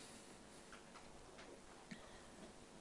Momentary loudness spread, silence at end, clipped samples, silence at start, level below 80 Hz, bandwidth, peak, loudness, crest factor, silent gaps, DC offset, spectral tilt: 3 LU; 0 s; under 0.1%; 0 s; -72 dBFS; 12 kHz; -40 dBFS; -59 LUFS; 18 dB; none; under 0.1%; -3.5 dB/octave